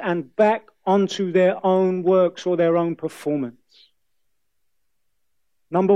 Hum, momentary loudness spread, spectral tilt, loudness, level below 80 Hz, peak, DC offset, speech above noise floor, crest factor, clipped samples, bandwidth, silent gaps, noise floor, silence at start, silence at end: none; 7 LU; -7 dB/octave; -21 LUFS; -72 dBFS; -4 dBFS; under 0.1%; 58 dB; 16 dB; under 0.1%; 11.5 kHz; none; -78 dBFS; 0 s; 0 s